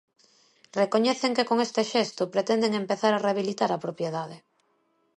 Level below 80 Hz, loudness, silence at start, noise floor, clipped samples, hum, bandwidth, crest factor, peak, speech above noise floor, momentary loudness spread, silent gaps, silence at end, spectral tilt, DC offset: -78 dBFS; -26 LUFS; 0.75 s; -70 dBFS; under 0.1%; none; 11.5 kHz; 18 dB; -10 dBFS; 44 dB; 8 LU; none; 0.8 s; -4.5 dB/octave; under 0.1%